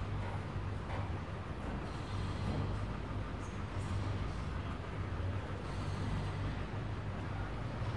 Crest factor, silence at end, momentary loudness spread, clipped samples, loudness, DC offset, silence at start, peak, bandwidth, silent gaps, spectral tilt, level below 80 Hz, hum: 12 dB; 0 s; 3 LU; under 0.1%; -41 LUFS; 0.2%; 0 s; -26 dBFS; 11 kHz; none; -7 dB/octave; -46 dBFS; none